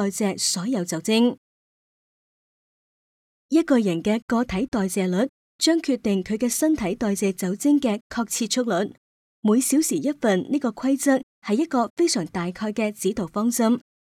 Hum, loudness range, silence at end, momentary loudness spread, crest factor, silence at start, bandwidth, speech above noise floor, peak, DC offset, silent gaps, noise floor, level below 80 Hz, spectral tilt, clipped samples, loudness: none; 3 LU; 0.25 s; 6 LU; 18 dB; 0 s; 17.5 kHz; over 68 dB; -6 dBFS; under 0.1%; 1.38-3.49 s, 4.22-4.28 s, 4.68-4.72 s, 5.29-5.59 s, 8.01-8.10 s, 8.98-9.43 s, 11.23-11.42 s, 11.90-11.97 s; under -90 dBFS; -56 dBFS; -4.5 dB/octave; under 0.1%; -23 LUFS